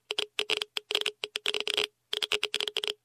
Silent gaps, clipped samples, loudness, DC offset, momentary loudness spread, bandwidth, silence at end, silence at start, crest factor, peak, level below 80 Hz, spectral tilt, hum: none; under 0.1%; -30 LUFS; under 0.1%; 3 LU; 15.5 kHz; 0.1 s; 0.1 s; 20 dB; -14 dBFS; -74 dBFS; 1 dB/octave; none